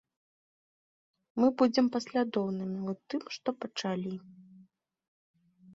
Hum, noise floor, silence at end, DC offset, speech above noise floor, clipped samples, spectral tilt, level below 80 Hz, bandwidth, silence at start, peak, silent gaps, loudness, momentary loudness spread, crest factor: none; -63 dBFS; 0 s; under 0.1%; 32 dB; under 0.1%; -6 dB/octave; -76 dBFS; 7.8 kHz; 1.35 s; -14 dBFS; 5.08-5.34 s; -32 LUFS; 11 LU; 20 dB